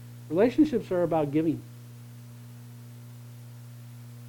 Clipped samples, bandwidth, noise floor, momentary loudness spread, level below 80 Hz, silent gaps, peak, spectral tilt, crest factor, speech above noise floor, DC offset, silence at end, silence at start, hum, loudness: under 0.1%; 19 kHz; -45 dBFS; 21 LU; -60 dBFS; none; -10 dBFS; -8 dB/octave; 20 dB; 20 dB; under 0.1%; 0 s; 0 s; 60 Hz at -45 dBFS; -26 LUFS